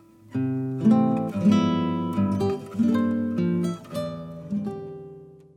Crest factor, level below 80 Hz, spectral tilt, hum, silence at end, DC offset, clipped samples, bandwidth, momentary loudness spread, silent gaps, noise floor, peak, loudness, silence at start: 16 dB; -64 dBFS; -8 dB/octave; none; 0.2 s; under 0.1%; under 0.1%; 11.5 kHz; 13 LU; none; -45 dBFS; -10 dBFS; -25 LUFS; 0.3 s